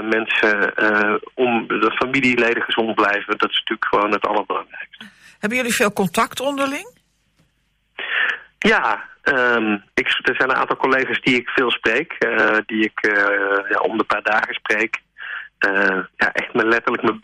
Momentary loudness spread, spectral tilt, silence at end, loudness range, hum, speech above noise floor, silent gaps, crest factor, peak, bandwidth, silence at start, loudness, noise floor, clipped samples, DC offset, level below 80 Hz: 6 LU; -3.5 dB/octave; 0.05 s; 4 LU; none; 46 dB; none; 14 dB; -6 dBFS; 15 kHz; 0 s; -18 LUFS; -65 dBFS; under 0.1%; under 0.1%; -56 dBFS